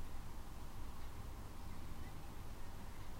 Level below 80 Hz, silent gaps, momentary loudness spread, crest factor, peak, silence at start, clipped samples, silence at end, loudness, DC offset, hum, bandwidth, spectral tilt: -50 dBFS; none; 1 LU; 10 dB; -34 dBFS; 0 s; under 0.1%; 0 s; -53 LUFS; under 0.1%; none; 16 kHz; -5 dB/octave